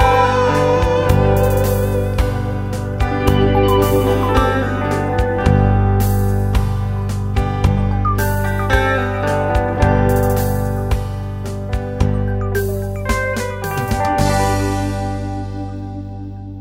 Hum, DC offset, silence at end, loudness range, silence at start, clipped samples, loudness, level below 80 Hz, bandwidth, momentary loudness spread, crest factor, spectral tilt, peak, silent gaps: 50 Hz at -40 dBFS; 0.4%; 0 s; 4 LU; 0 s; under 0.1%; -17 LUFS; -24 dBFS; 16.5 kHz; 9 LU; 16 dB; -6.5 dB/octave; 0 dBFS; none